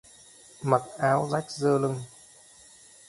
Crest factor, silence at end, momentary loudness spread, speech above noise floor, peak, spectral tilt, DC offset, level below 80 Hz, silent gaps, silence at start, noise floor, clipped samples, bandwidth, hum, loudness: 22 dB; 1 s; 11 LU; 28 dB; -6 dBFS; -6 dB/octave; under 0.1%; -66 dBFS; none; 0.6 s; -53 dBFS; under 0.1%; 11.5 kHz; none; -27 LUFS